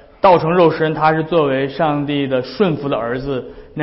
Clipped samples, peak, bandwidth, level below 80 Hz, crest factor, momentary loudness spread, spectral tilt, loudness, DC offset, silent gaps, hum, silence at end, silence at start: under 0.1%; -2 dBFS; 5.8 kHz; -44 dBFS; 14 dB; 9 LU; -11 dB/octave; -16 LUFS; under 0.1%; none; none; 0 s; 0.25 s